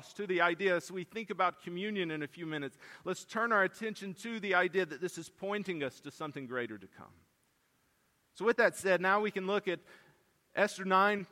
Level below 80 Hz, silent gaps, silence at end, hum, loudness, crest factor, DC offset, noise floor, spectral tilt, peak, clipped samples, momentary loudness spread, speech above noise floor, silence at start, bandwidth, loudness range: -82 dBFS; none; 0.05 s; none; -33 LUFS; 20 dB; under 0.1%; -74 dBFS; -4.5 dB/octave; -14 dBFS; under 0.1%; 13 LU; 41 dB; 0 s; 16 kHz; 7 LU